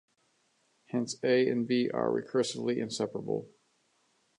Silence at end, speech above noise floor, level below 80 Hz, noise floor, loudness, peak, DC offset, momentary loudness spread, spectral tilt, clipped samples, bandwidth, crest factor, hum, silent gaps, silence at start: 0.9 s; 43 dB; -78 dBFS; -73 dBFS; -31 LUFS; -14 dBFS; under 0.1%; 9 LU; -5 dB/octave; under 0.1%; 11.5 kHz; 18 dB; none; none; 0.95 s